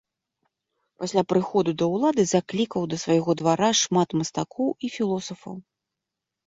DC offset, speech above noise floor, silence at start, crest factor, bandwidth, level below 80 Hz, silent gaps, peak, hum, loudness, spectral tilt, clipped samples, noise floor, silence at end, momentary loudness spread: under 0.1%; 62 dB; 1 s; 18 dB; 8 kHz; -64 dBFS; none; -8 dBFS; none; -24 LUFS; -4.5 dB/octave; under 0.1%; -85 dBFS; 0.85 s; 11 LU